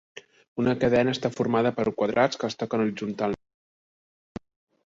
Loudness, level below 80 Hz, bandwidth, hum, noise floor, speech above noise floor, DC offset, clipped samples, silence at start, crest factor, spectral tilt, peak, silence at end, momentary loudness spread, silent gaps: -25 LUFS; -58 dBFS; 7.8 kHz; none; under -90 dBFS; over 66 dB; under 0.1%; under 0.1%; 0.15 s; 18 dB; -6 dB/octave; -8 dBFS; 1.5 s; 19 LU; 0.48-0.56 s